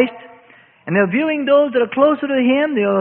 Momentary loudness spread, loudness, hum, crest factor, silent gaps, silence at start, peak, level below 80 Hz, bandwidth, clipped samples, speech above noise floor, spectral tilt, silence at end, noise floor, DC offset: 5 LU; -16 LUFS; none; 14 dB; none; 0 s; -2 dBFS; -62 dBFS; 4.2 kHz; under 0.1%; 33 dB; -11.5 dB/octave; 0 s; -48 dBFS; under 0.1%